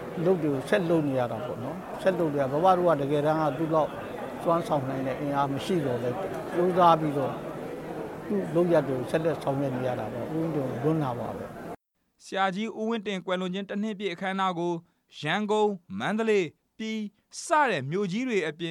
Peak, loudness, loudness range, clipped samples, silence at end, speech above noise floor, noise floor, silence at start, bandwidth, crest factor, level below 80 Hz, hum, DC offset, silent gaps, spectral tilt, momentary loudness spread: -8 dBFS; -28 LUFS; 5 LU; under 0.1%; 0 s; 22 dB; -49 dBFS; 0 s; 16.5 kHz; 20 dB; -62 dBFS; none; under 0.1%; none; -6.5 dB/octave; 12 LU